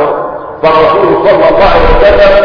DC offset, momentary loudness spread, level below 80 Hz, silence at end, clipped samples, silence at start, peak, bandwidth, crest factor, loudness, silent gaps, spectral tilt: under 0.1%; 8 LU; -16 dBFS; 0 s; 5%; 0 s; 0 dBFS; 5.4 kHz; 6 dB; -6 LUFS; none; -7 dB/octave